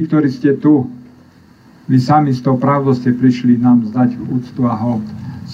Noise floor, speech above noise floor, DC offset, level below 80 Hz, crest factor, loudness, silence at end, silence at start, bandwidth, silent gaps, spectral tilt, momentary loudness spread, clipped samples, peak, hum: -44 dBFS; 31 dB; under 0.1%; -56 dBFS; 14 dB; -14 LUFS; 0 s; 0 s; 7.4 kHz; none; -9 dB/octave; 10 LU; under 0.1%; -2 dBFS; none